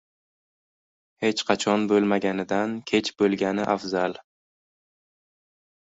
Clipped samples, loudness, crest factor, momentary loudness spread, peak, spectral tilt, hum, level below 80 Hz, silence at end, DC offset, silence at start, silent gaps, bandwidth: under 0.1%; -24 LUFS; 22 dB; 6 LU; -4 dBFS; -5 dB/octave; none; -64 dBFS; 1.7 s; under 0.1%; 1.2 s; none; 8 kHz